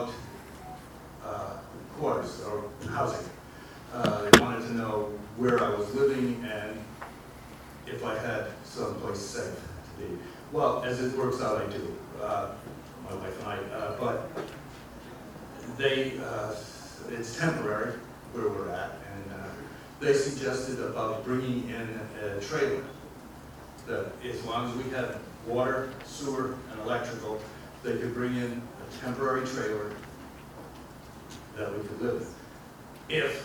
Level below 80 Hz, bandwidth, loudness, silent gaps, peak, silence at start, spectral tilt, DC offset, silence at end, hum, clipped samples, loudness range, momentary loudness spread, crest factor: -54 dBFS; over 20 kHz; -31 LUFS; none; 0 dBFS; 0 s; -4.5 dB/octave; under 0.1%; 0 s; none; under 0.1%; 10 LU; 18 LU; 32 dB